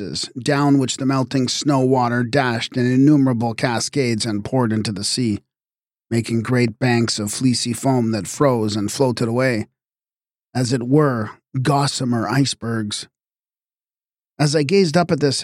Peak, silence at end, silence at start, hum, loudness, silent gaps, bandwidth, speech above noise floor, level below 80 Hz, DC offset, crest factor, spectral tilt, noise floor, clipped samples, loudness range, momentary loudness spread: -4 dBFS; 0 s; 0 s; none; -19 LUFS; none; 15.5 kHz; over 72 dB; -58 dBFS; under 0.1%; 16 dB; -5.5 dB/octave; under -90 dBFS; under 0.1%; 3 LU; 8 LU